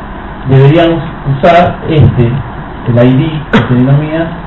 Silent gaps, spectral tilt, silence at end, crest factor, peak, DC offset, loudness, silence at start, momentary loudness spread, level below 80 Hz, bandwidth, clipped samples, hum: none; -9.5 dB/octave; 0 s; 8 dB; 0 dBFS; 1%; -8 LUFS; 0 s; 12 LU; -26 dBFS; 5.2 kHz; 2%; none